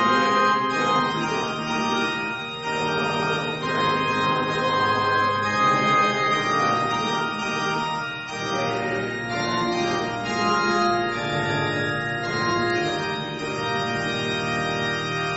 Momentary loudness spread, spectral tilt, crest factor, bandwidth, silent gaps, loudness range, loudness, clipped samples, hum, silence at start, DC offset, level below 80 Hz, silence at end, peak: 7 LU; -4.5 dB/octave; 14 dB; 8.4 kHz; none; 4 LU; -23 LUFS; under 0.1%; none; 0 s; under 0.1%; -54 dBFS; 0 s; -8 dBFS